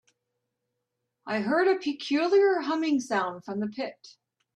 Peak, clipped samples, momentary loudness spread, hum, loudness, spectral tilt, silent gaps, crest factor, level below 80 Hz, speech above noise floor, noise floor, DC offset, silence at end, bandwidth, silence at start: -12 dBFS; under 0.1%; 11 LU; none; -27 LUFS; -5 dB/octave; none; 16 dB; -76 dBFS; 56 dB; -82 dBFS; under 0.1%; 0.45 s; 9.4 kHz; 1.25 s